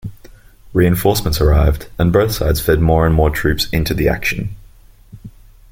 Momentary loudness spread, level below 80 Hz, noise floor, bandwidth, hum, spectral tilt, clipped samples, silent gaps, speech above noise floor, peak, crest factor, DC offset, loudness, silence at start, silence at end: 7 LU; -24 dBFS; -43 dBFS; 17 kHz; none; -6 dB/octave; under 0.1%; none; 29 dB; -2 dBFS; 14 dB; under 0.1%; -15 LUFS; 0.05 s; 0.4 s